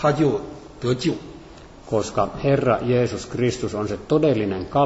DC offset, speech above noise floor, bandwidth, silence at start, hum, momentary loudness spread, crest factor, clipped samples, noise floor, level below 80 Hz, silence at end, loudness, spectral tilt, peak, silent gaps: under 0.1%; 22 dB; 8 kHz; 0 s; none; 10 LU; 16 dB; under 0.1%; -43 dBFS; -46 dBFS; 0 s; -22 LUFS; -6.5 dB/octave; -6 dBFS; none